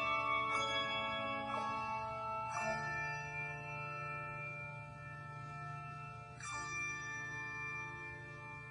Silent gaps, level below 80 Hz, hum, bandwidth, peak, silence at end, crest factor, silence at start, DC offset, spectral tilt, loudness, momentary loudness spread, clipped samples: none; -66 dBFS; none; 10.5 kHz; -24 dBFS; 0 s; 18 dB; 0 s; under 0.1%; -3.5 dB/octave; -41 LUFS; 13 LU; under 0.1%